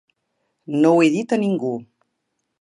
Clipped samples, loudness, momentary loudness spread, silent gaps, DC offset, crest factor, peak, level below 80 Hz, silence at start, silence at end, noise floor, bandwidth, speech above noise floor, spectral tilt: under 0.1%; -19 LUFS; 12 LU; none; under 0.1%; 18 dB; -4 dBFS; -74 dBFS; 0.7 s; 0.8 s; -75 dBFS; 10.5 kHz; 57 dB; -6.5 dB/octave